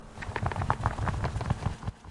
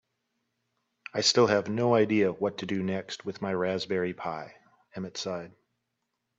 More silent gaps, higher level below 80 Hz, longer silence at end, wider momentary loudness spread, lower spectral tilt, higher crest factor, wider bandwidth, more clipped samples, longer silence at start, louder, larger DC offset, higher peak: neither; first, -40 dBFS vs -72 dBFS; second, 0 s vs 0.9 s; second, 6 LU vs 17 LU; first, -6.5 dB/octave vs -4.5 dB/octave; about the same, 24 dB vs 20 dB; first, 11.5 kHz vs 8.4 kHz; neither; second, 0 s vs 1.15 s; second, -32 LUFS vs -28 LUFS; neither; about the same, -8 dBFS vs -10 dBFS